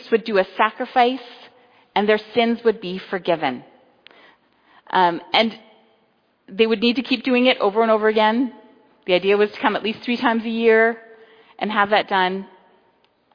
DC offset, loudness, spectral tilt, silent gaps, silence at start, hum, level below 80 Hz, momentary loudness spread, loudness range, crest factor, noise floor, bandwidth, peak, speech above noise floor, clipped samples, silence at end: under 0.1%; -19 LUFS; -6.5 dB/octave; none; 0 s; none; -68 dBFS; 10 LU; 4 LU; 20 dB; -63 dBFS; 5.2 kHz; -2 dBFS; 44 dB; under 0.1%; 0.9 s